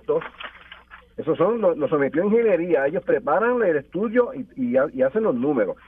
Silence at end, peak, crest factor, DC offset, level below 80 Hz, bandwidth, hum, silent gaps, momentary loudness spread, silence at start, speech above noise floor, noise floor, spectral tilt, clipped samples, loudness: 0.15 s; -6 dBFS; 14 dB; under 0.1%; -58 dBFS; 3.7 kHz; none; none; 9 LU; 0.1 s; 25 dB; -46 dBFS; -9.5 dB/octave; under 0.1%; -22 LUFS